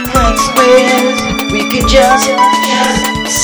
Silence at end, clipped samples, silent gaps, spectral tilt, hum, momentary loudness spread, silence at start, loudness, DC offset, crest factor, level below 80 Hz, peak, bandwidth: 0 s; 0.3%; none; -3 dB/octave; none; 6 LU; 0 s; -9 LUFS; under 0.1%; 10 dB; -22 dBFS; 0 dBFS; over 20 kHz